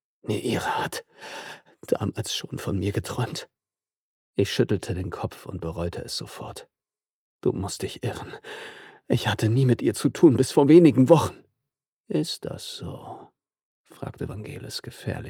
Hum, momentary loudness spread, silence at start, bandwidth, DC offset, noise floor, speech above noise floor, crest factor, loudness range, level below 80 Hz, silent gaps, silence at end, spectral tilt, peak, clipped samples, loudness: none; 20 LU; 0.25 s; 17.5 kHz; under 0.1%; under -90 dBFS; over 66 dB; 22 dB; 13 LU; -54 dBFS; 3.97-4.34 s, 7.10-7.39 s, 11.88-12.04 s, 13.63-13.84 s; 0 s; -6 dB/octave; -2 dBFS; under 0.1%; -24 LUFS